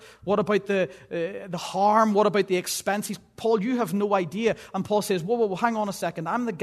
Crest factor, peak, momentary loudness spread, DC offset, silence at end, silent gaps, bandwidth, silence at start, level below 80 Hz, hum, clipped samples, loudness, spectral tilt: 18 dB; -8 dBFS; 10 LU; under 0.1%; 0 s; none; 13.5 kHz; 0 s; -66 dBFS; none; under 0.1%; -25 LUFS; -5 dB/octave